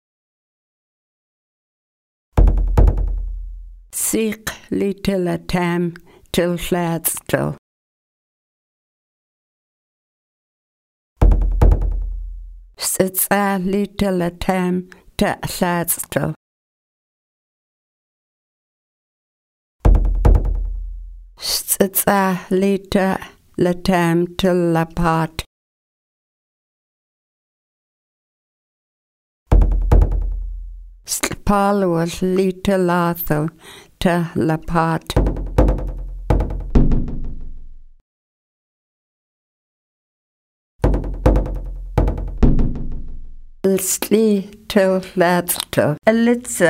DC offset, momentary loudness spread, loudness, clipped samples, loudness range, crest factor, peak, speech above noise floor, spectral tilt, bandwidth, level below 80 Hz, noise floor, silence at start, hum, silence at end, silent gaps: under 0.1%; 14 LU; -19 LUFS; under 0.1%; 8 LU; 20 dB; 0 dBFS; over 72 dB; -5.5 dB/octave; 16 kHz; -24 dBFS; under -90 dBFS; 2.35 s; none; 0 s; 7.58-11.16 s, 16.36-19.79 s, 25.46-29.46 s, 38.01-40.79 s